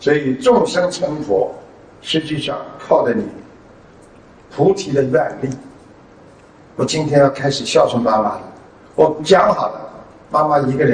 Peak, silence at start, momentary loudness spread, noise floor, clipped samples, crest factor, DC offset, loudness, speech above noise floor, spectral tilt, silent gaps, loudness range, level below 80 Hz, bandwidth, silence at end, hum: 0 dBFS; 0 s; 16 LU; -44 dBFS; under 0.1%; 18 dB; under 0.1%; -16 LUFS; 28 dB; -5.5 dB/octave; none; 6 LU; -50 dBFS; 10 kHz; 0 s; none